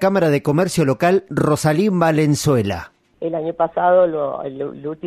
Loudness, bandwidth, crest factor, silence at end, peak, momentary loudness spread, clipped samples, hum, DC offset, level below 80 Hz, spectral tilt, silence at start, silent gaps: -18 LUFS; 15 kHz; 14 dB; 0 s; -4 dBFS; 11 LU; under 0.1%; none; under 0.1%; -52 dBFS; -6.5 dB/octave; 0 s; none